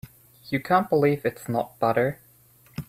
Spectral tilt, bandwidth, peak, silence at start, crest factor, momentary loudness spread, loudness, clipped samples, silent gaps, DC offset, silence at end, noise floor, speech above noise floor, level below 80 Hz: -7 dB/octave; 16 kHz; -6 dBFS; 0.05 s; 18 dB; 9 LU; -24 LUFS; under 0.1%; none; under 0.1%; 0.05 s; -56 dBFS; 33 dB; -60 dBFS